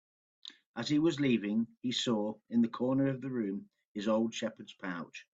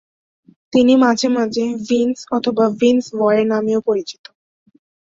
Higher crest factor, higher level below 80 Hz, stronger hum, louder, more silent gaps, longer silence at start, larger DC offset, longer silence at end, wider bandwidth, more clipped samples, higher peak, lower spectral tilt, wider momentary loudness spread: about the same, 16 dB vs 14 dB; second, -74 dBFS vs -58 dBFS; neither; second, -33 LUFS vs -16 LUFS; first, 0.66-0.74 s, 3.85-3.95 s vs none; second, 0.45 s vs 0.75 s; neither; second, 0.15 s vs 0.95 s; about the same, 8 kHz vs 7.8 kHz; neither; second, -18 dBFS vs -2 dBFS; about the same, -5.5 dB/octave vs -5 dB/octave; first, 14 LU vs 8 LU